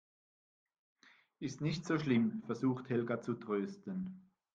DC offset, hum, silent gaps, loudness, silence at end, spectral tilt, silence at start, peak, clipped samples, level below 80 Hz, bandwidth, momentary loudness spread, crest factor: under 0.1%; none; none; -37 LUFS; 0.35 s; -7 dB/octave; 1.4 s; -20 dBFS; under 0.1%; -76 dBFS; 7.8 kHz; 12 LU; 18 dB